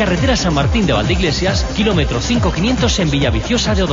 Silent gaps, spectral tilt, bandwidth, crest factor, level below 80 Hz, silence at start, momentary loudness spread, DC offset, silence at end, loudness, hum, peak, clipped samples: none; -5 dB/octave; 7.8 kHz; 12 dB; -22 dBFS; 0 s; 2 LU; under 0.1%; 0 s; -15 LUFS; none; -2 dBFS; under 0.1%